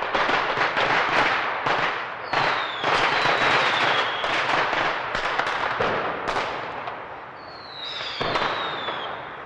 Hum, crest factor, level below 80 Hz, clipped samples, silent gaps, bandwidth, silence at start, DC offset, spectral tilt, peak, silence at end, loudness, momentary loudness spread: none; 18 dB; -52 dBFS; under 0.1%; none; 11.5 kHz; 0 s; under 0.1%; -3 dB/octave; -6 dBFS; 0 s; -23 LUFS; 13 LU